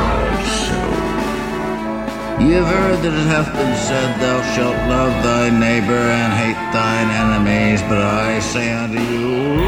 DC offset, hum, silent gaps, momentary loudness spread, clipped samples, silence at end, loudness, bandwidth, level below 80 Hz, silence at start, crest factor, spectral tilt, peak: 0.2%; none; none; 6 LU; under 0.1%; 0 s; -17 LUFS; 16.5 kHz; -30 dBFS; 0 s; 14 dB; -5.5 dB/octave; -2 dBFS